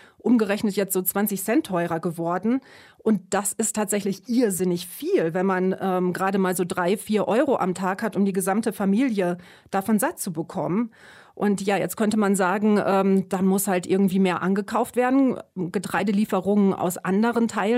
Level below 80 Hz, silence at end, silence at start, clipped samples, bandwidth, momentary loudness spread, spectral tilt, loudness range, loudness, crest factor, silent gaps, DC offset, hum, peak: -66 dBFS; 0 s; 0.25 s; under 0.1%; 16 kHz; 6 LU; -5.5 dB/octave; 3 LU; -23 LUFS; 14 dB; none; under 0.1%; none; -8 dBFS